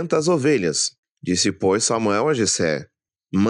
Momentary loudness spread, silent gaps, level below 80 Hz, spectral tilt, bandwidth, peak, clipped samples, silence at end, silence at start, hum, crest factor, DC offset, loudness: 7 LU; 0.98-1.03 s, 1.11-1.15 s; -64 dBFS; -4 dB/octave; 11.5 kHz; -6 dBFS; under 0.1%; 0 s; 0 s; none; 14 dB; under 0.1%; -20 LUFS